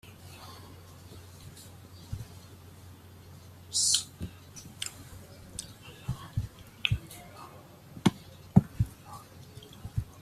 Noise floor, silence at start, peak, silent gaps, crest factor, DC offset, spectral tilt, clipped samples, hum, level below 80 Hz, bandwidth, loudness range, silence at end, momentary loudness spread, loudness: -51 dBFS; 0.05 s; -6 dBFS; none; 30 dB; under 0.1%; -3.5 dB/octave; under 0.1%; none; -50 dBFS; 15 kHz; 14 LU; 0 s; 24 LU; -32 LUFS